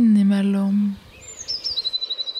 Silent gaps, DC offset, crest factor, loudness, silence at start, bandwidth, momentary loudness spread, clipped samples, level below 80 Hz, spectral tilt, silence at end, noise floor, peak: none; under 0.1%; 12 dB; -21 LUFS; 0 s; 10 kHz; 17 LU; under 0.1%; -56 dBFS; -5.5 dB/octave; 0 s; -40 dBFS; -10 dBFS